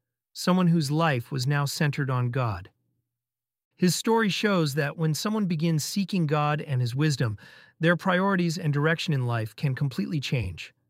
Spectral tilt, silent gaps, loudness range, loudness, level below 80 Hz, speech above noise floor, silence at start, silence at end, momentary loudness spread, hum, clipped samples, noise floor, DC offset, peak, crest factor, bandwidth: -5.5 dB/octave; 3.65-3.71 s; 2 LU; -26 LUFS; -58 dBFS; over 65 dB; 0.35 s; 0.2 s; 6 LU; none; under 0.1%; under -90 dBFS; under 0.1%; -8 dBFS; 18 dB; 16 kHz